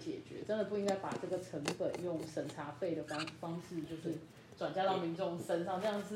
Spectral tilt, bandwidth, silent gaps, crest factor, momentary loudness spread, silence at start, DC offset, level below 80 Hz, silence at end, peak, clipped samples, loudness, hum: -5.5 dB/octave; 16 kHz; none; 20 dB; 9 LU; 0 s; under 0.1%; -76 dBFS; 0 s; -20 dBFS; under 0.1%; -39 LUFS; none